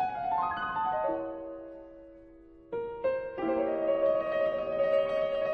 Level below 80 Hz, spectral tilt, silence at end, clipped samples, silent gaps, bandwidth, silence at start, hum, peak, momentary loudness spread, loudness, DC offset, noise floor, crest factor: -60 dBFS; -7 dB/octave; 0 s; under 0.1%; none; 5.4 kHz; 0 s; none; -16 dBFS; 16 LU; -31 LUFS; under 0.1%; -53 dBFS; 14 dB